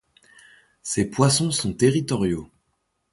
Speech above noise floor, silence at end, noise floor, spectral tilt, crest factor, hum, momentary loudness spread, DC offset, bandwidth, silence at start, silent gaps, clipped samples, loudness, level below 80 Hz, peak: 52 dB; 0.65 s; -73 dBFS; -5 dB/octave; 18 dB; none; 10 LU; under 0.1%; 12 kHz; 0.85 s; none; under 0.1%; -22 LUFS; -50 dBFS; -6 dBFS